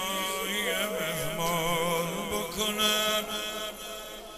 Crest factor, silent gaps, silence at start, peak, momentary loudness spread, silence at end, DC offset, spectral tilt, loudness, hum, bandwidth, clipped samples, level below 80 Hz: 16 dB; none; 0 s; -14 dBFS; 11 LU; 0 s; under 0.1%; -2.5 dB/octave; -29 LUFS; none; 16 kHz; under 0.1%; -52 dBFS